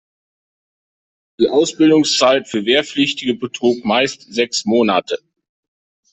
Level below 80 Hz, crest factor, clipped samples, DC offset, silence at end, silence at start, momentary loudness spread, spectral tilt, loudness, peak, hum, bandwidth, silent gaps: -58 dBFS; 16 dB; under 0.1%; under 0.1%; 0.95 s; 1.4 s; 8 LU; -3.5 dB/octave; -16 LUFS; -2 dBFS; none; 8.4 kHz; none